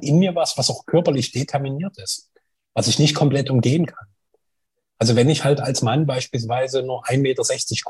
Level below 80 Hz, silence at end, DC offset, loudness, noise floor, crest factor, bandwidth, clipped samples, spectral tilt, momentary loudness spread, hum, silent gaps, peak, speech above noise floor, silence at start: -58 dBFS; 0 s; under 0.1%; -20 LUFS; -78 dBFS; 16 dB; 12.5 kHz; under 0.1%; -5 dB/octave; 10 LU; none; none; -4 dBFS; 59 dB; 0 s